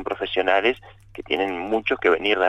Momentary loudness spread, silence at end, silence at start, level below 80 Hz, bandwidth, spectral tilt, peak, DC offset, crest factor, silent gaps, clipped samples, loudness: 15 LU; 0 s; 0 s; -52 dBFS; 8.8 kHz; -5 dB/octave; -6 dBFS; under 0.1%; 18 dB; none; under 0.1%; -22 LUFS